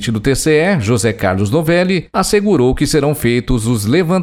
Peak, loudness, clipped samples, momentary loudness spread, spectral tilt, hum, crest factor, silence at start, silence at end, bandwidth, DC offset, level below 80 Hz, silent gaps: -2 dBFS; -14 LUFS; under 0.1%; 3 LU; -5.5 dB/octave; none; 12 dB; 0 s; 0 s; 17.5 kHz; under 0.1%; -30 dBFS; none